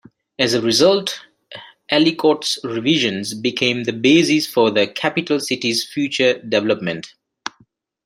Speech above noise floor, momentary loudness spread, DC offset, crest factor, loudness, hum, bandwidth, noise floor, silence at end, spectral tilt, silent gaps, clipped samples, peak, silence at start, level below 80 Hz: 40 dB; 18 LU; under 0.1%; 18 dB; -17 LUFS; none; 16 kHz; -57 dBFS; 1 s; -4 dB/octave; none; under 0.1%; -2 dBFS; 0.4 s; -64 dBFS